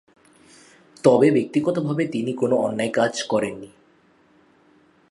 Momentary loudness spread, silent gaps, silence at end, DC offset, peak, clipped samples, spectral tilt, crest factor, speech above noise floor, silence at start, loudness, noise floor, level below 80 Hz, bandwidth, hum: 8 LU; none; 1.45 s; under 0.1%; -2 dBFS; under 0.1%; -6 dB/octave; 22 dB; 37 dB; 1.05 s; -21 LUFS; -58 dBFS; -66 dBFS; 11.5 kHz; none